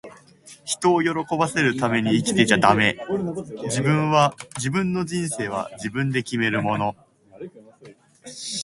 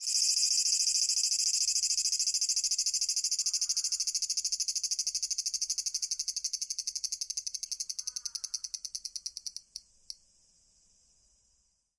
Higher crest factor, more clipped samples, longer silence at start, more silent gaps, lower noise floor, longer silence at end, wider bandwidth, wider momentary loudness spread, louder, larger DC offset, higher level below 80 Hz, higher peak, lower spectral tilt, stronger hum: about the same, 22 dB vs 20 dB; neither; about the same, 0.05 s vs 0 s; neither; second, -49 dBFS vs -73 dBFS; second, 0 s vs 1.85 s; about the same, 11.5 kHz vs 11.5 kHz; about the same, 13 LU vs 13 LU; first, -22 LUFS vs -29 LUFS; neither; first, -56 dBFS vs -74 dBFS; first, 0 dBFS vs -14 dBFS; first, -4.5 dB/octave vs 6.5 dB/octave; neither